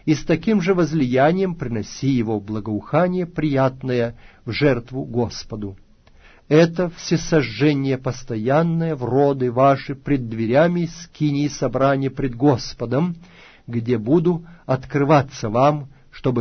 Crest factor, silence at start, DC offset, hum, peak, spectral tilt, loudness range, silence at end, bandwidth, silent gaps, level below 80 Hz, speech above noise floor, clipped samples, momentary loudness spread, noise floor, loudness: 18 dB; 0.05 s; under 0.1%; none; -2 dBFS; -7 dB/octave; 3 LU; 0 s; 6.6 kHz; none; -44 dBFS; 30 dB; under 0.1%; 10 LU; -49 dBFS; -20 LUFS